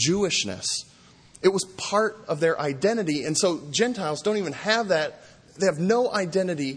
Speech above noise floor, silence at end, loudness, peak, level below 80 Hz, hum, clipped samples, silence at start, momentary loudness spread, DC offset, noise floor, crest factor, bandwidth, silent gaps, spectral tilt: 28 dB; 0 s; -24 LUFS; -6 dBFS; -62 dBFS; none; under 0.1%; 0 s; 5 LU; under 0.1%; -52 dBFS; 18 dB; 10.5 kHz; none; -3.5 dB/octave